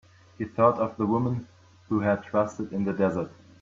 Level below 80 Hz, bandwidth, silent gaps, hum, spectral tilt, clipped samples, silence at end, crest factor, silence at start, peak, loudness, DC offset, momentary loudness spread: -62 dBFS; 7.6 kHz; none; none; -8.5 dB/octave; under 0.1%; 0.3 s; 20 dB; 0.4 s; -8 dBFS; -27 LUFS; under 0.1%; 12 LU